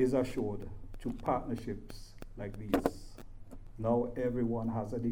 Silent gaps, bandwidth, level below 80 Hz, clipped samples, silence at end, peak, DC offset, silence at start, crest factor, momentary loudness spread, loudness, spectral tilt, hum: none; 16.5 kHz; -48 dBFS; under 0.1%; 0 s; -12 dBFS; under 0.1%; 0 s; 22 dB; 20 LU; -36 LUFS; -7.5 dB/octave; none